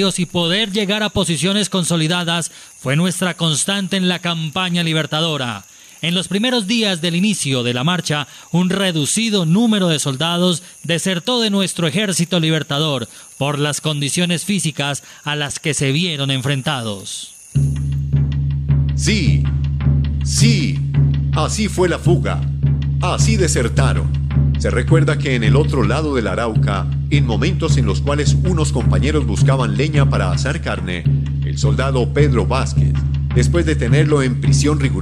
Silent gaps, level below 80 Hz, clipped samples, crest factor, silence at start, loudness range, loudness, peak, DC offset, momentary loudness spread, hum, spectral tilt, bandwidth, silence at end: none; -26 dBFS; under 0.1%; 16 dB; 0 s; 3 LU; -17 LUFS; 0 dBFS; under 0.1%; 5 LU; none; -5 dB/octave; 14 kHz; 0 s